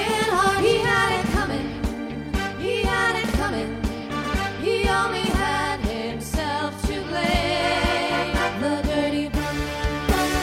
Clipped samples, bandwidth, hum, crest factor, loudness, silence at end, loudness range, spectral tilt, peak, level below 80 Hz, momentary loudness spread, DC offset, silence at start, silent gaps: under 0.1%; 16.5 kHz; none; 16 dB; -23 LUFS; 0 s; 2 LU; -4.5 dB/octave; -8 dBFS; -32 dBFS; 8 LU; under 0.1%; 0 s; none